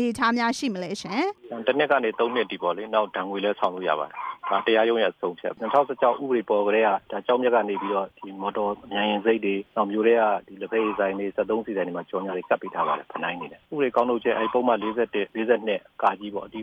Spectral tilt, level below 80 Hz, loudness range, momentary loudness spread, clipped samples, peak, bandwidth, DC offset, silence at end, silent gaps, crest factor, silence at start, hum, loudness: -5 dB/octave; -68 dBFS; 3 LU; 9 LU; under 0.1%; -6 dBFS; 10.5 kHz; under 0.1%; 0 s; none; 18 dB; 0 s; none; -25 LUFS